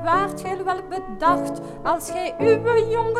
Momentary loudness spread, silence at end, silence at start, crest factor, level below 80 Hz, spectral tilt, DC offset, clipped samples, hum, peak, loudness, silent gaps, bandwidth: 9 LU; 0 s; 0 s; 16 dB; -46 dBFS; -5.5 dB/octave; under 0.1%; under 0.1%; none; -6 dBFS; -22 LUFS; none; 14.5 kHz